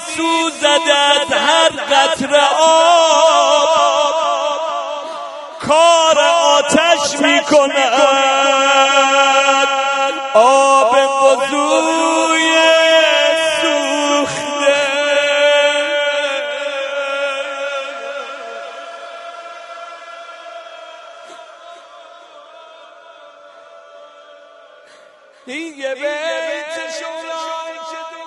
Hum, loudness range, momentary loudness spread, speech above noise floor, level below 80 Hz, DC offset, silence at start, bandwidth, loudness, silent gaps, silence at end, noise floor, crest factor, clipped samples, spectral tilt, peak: none; 18 LU; 19 LU; 32 dB; -64 dBFS; under 0.1%; 0 s; 11.5 kHz; -13 LUFS; none; 0 s; -45 dBFS; 14 dB; under 0.1%; -1 dB/octave; 0 dBFS